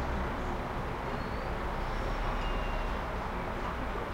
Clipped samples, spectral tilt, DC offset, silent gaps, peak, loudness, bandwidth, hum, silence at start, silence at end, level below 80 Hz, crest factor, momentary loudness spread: under 0.1%; -6 dB/octave; under 0.1%; none; -22 dBFS; -36 LUFS; 16 kHz; none; 0 s; 0 s; -38 dBFS; 12 dB; 2 LU